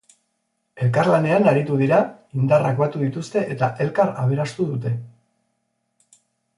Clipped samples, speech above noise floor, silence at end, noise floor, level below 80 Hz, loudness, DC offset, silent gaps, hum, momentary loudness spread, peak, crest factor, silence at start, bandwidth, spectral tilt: under 0.1%; 54 dB; 1.5 s; -73 dBFS; -62 dBFS; -20 LUFS; under 0.1%; none; none; 8 LU; -4 dBFS; 18 dB; 0.75 s; 11.5 kHz; -8 dB/octave